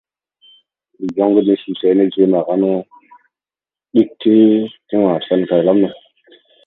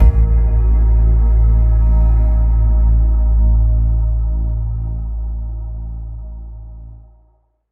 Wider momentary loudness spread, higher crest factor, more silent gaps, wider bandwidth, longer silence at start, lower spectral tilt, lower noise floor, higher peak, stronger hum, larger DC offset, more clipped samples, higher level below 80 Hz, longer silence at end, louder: second, 8 LU vs 16 LU; about the same, 16 dB vs 12 dB; neither; first, 4.1 kHz vs 2 kHz; first, 1 s vs 0 s; second, -9.5 dB/octave vs -12 dB/octave; first, under -90 dBFS vs -56 dBFS; about the same, 0 dBFS vs 0 dBFS; neither; neither; neither; second, -64 dBFS vs -14 dBFS; about the same, 0.75 s vs 0.75 s; about the same, -15 LUFS vs -16 LUFS